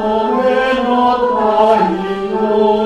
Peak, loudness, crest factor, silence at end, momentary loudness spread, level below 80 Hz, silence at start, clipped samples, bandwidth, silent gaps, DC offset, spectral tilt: 0 dBFS; -14 LUFS; 14 dB; 0 s; 6 LU; -44 dBFS; 0 s; under 0.1%; 11 kHz; none; under 0.1%; -6.5 dB/octave